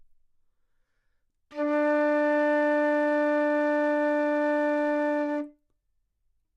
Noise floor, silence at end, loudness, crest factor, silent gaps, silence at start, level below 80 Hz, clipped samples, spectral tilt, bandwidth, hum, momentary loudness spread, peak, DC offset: -74 dBFS; 1.05 s; -25 LUFS; 8 dB; none; 1.5 s; -74 dBFS; under 0.1%; -4.5 dB/octave; 7.4 kHz; none; 7 LU; -18 dBFS; under 0.1%